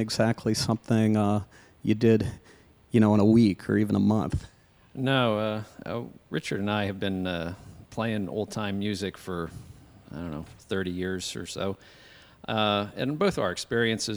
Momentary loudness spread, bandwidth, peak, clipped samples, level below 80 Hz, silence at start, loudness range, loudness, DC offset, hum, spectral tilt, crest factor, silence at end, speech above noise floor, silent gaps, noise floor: 15 LU; over 20 kHz; -8 dBFS; under 0.1%; -54 dBFS; 0 s; 9 LU; -27 LUFS; under 0.1%; none; -6 dB/octave; 18 dB; 0 s; 27 dB; none; -53 dBFS